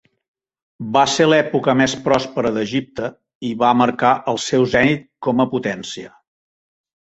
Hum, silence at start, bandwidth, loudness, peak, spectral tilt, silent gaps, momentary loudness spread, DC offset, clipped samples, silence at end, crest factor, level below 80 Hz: none; 0.8 s; 8.2 kHz; -18 LUFS; -2 dBFS; -5 dB/octave; 3.35-3.41 s; 13 LU; under 0.1%; under 0.1%; 0.95 s; 18 dB; -52 dBFS